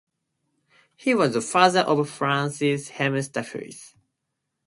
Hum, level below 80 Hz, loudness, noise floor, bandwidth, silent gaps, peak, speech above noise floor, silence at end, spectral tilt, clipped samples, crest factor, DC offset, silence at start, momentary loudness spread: none; -70 dBFS; -23 LUFS; -80 dBFS; 11.5 kHz; none; -2 dBFS; 57 dB; 0.8 s; -4.5 dB/octave; under 0.1%; 24 dB; under 0.1%; 1.05 s; 17 LU